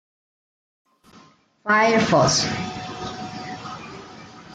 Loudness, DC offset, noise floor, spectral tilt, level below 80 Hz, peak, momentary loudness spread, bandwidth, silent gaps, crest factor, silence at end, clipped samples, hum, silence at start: -20 LUFS; under 0.1%; -53 dBFS; -3.5 dB/octave; -56 dBFS; -6 dBFS; 22 LU; 10 kHz; none; 18 dB; 0 s; under 0.1%; none; 1.65 s